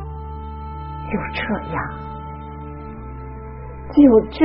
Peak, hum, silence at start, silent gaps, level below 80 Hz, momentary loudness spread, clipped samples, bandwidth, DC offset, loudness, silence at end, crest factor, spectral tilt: -2 dBFS; none; 0 s; none; -36 dBFS; 21 LU; under 0.1%; 5.4 kHz; under 0.1%; -19 LUFS; 0 s; 18 dB; -6.5 dB/octave